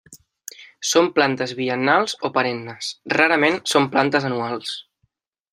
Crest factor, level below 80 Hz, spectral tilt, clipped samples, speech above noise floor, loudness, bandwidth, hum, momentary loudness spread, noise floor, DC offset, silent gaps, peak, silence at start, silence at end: 20 dB; -68 dBFS; -3.5 dB/octave; under 0.1%; 50 dB; -20 LUFS; 15.5 kHz; none; 15 LU; -70 dBFS; under 0.1%; none; 0 dBFS; 0.1 s; 0.7 s